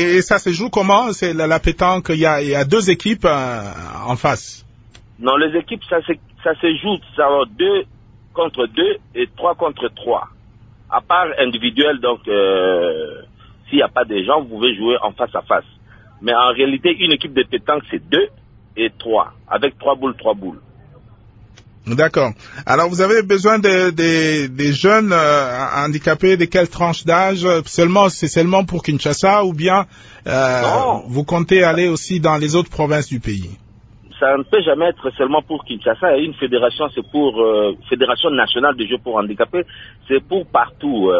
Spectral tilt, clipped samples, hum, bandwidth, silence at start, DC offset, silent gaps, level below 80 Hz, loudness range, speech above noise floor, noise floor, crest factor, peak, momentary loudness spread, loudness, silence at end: -5 dB/octave; under 0.1%; none; 8 kHz; 0 s; under 0.1%; none; -42 dBFS; 5 LU; 29 dB; -45 dBFS; 16 dB; 0 dBFS; 8 LU; -16 LUFS; 0 s